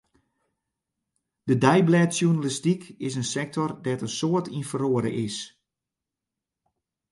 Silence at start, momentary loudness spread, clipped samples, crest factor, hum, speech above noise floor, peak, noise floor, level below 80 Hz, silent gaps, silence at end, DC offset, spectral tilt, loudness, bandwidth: 1.45 s; 12 LU; under 0.1%; 22 dB; none; 63 dB; -4 dBFS; -87 dBFS; -66 dBFS; none; 1.65 s; under 0.1%; -5.5 dB/octave; -25 LUFS; 11.5 kHz